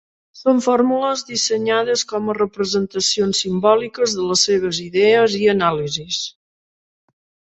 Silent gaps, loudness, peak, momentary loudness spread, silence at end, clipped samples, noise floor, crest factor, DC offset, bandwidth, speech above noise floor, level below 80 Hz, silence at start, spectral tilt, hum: none; -18 LUFS; -2 dBFS; 7 LU; 1.3 s; under 0.1%; under -90 dBFS; 16 dB; under 0.1%; 8.2 kHz; over 72 dB; -58 dBFS; 0.35 s; -3.5 dB/octave; none